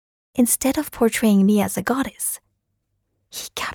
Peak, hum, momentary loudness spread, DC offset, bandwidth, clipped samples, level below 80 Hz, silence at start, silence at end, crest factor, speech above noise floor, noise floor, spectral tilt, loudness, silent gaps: -6 dBFS; none; 15 LU; under 0.1%; 19.5 kHz; under 0.1%; -52 dBFS; 0.35 s; 0 s; 16 dB; 53 dB; -73 dBFS; -4.5 dB/octave; -20 LUFS; none